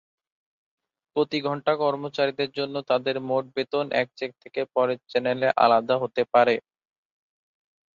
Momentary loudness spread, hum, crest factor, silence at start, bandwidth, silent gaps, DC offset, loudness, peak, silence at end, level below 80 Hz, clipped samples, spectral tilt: 9 LU; none; 22 dB; 1.15 s; 7.2 kHz; none; under 0.1%; -25 LUFS; -4 dBFS; 1.35 s; -72 dBFS; under 0.1%; -6.5 dB/octave